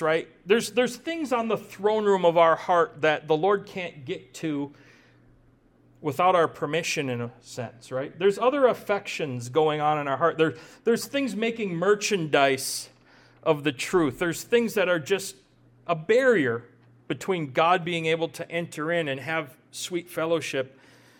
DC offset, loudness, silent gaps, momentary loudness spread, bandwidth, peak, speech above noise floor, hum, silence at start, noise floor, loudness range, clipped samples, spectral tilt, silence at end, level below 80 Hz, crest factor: under 0.1%; -25 LUFS; none; 12 LU; 18.5 kHz; -6 dBFS; 34 dB; none; 0 s; -59 dBFS; 4 LU; under 0.1%; -4.5 dB/octave; 0.5 s; -66 dBFS; 18 dB